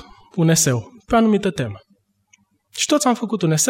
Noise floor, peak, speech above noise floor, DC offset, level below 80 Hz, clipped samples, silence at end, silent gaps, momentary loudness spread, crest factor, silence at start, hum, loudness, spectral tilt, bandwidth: -59 dBFS; -6 dBFS; 42 dB; under 0.1%; -48 dBFS; under 0.1%; 0 s; none; 13 LU; 14 dB; 0.35 s; none; -19 LUFS; -4.5 dB/octave; 16.5 kHz